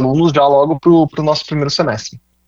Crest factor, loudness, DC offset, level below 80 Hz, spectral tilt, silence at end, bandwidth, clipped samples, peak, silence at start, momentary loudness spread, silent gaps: 12 dB; -13 LUFS; under 0.1%; -46 dBFS; -6.5 dB/octave; 0.3 s; 7.6 kHz; under 0.1%; -2 dBFS; 0 s; 7 LU; none